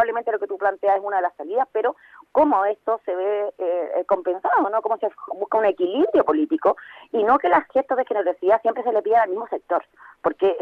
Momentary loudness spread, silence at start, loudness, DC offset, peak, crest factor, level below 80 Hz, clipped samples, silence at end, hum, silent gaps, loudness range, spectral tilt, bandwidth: 7 LU; 0 s; -22 LUFS; under 0.1%; -4 dBFS; 18 dB; -64 dBFS; under 0.1%; 0 s; none; none; 2 LU; -7 dB/octave; 5.2 kHz